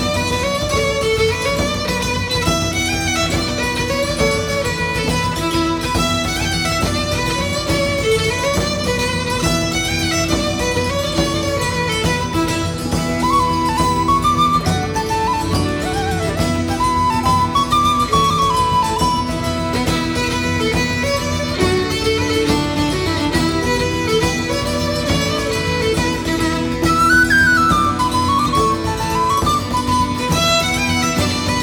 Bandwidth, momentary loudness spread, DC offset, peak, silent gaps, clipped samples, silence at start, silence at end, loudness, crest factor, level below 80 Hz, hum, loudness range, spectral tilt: 19.5 kHz; 4 LU; under 0.1%; -2 dBFS; none; under 0.1%; 0 s; 0 s; -17 LUFS; 14 dB; -32 dBFS; none; 3 LU; -4 dB/octave